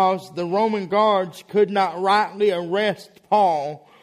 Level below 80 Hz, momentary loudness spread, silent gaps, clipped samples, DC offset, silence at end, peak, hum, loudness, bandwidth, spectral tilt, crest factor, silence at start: -70 dBFS; 7 LU; none; under 0.1%; under 0.1%; 0.25 s; -6 dBFS; none; -21 LUFS; 14 kHz; -5.5 dB/octave; 16 dB; 0 s